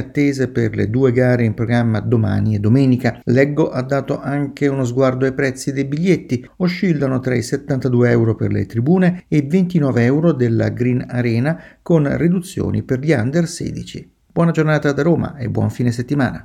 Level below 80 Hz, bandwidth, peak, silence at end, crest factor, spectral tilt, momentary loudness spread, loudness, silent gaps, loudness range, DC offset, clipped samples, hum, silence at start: -46 dBFS; 13.5 kHz; 0 dBFS; 0 s; 16 dB; -7.5 dB/octave; 6 LU; -17 LUFS; none; 3 LU; under 0.1%; under 0.1%; none; 0 s